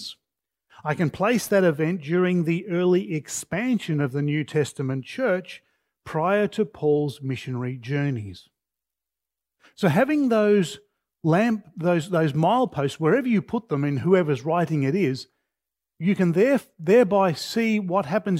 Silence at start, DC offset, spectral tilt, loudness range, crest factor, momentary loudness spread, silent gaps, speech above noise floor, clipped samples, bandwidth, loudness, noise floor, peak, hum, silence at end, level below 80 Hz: 0 s; under 0.1%; -6.5 dB/octave; 4 LU; 18 dB; 9 LU; none; 66 dB; under 0.1%; 16 kHz; -23 LUFS; -88 dBFS; -6 dBFS; none; 0 s; -66 dBFS